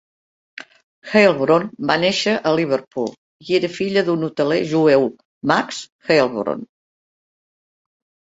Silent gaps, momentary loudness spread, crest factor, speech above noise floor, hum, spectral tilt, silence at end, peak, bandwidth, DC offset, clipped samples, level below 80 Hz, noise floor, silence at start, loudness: 3.18-3.40 s, 5.25-5.41 s, 5.92-5.99 s; 13 LU; 18 dB; over 72 dB; none; -5 dB/octave; 1.7 s; -2 dBFS; 8 kHz; under 0.1%; under 0.1%; -62 dBFS; under -90 dBFS; 1.05 s; -18 LUFS